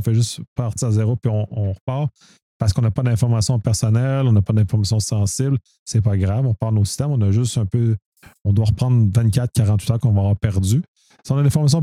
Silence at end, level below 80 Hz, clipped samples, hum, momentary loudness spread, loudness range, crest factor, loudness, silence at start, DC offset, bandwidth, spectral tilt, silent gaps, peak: 0 s; -42 dBFS; under 0.1%; none; 7 LU; 2 LU; 14 dB; -19 LUFS; 0 s; under 0.1%; 13.5 kHz; -6.5 dB/octave; 0.47-0.56 s, 1.81-1.87 s, 2.42-2.60 s, 5.79-5.86 s, 8.06-8.12 s, 8.41-8.45 s, 10.88-10.95 s; -4 dBFS